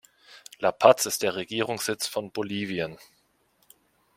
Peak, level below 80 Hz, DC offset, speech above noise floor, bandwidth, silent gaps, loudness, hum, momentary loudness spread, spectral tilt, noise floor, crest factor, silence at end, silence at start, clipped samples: -2 dBFS; -70 dBFS; under 0.1%; 42 dB; 16.5 kHz; none; -26 LUFS; none; 13 LU; -3 dB/octave; -67 dBFS; 26 dB; 1.2 s; 0.3 s; under 0.1%